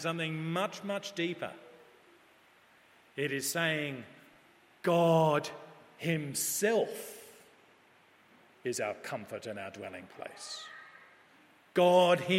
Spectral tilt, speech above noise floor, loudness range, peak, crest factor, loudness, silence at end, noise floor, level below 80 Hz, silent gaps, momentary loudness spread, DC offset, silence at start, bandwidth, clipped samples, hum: -4 dB/octave; 32 dB; 10 LU; -12 dBFS; 22 dB; -32 LUFS; 0 s; -63 dBFS; -82 dBFS; none; 21 LU; under 0.1%; 0 s; 16 kHz; under 0.1%; none